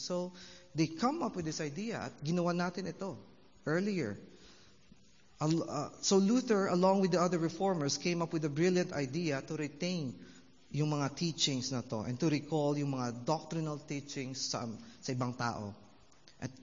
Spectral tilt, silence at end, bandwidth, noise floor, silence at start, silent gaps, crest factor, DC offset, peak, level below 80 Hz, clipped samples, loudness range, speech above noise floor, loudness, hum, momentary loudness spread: -5.5 dB/octave; 0 s; 7.4 kHz; -64 dBFS; 0 s; none; 20 dB; under 0.1%; -16 dBFS; -72 dBFS; under 0.1%; 7 LU; 30 dB; -34 LUFS; none; 14 LU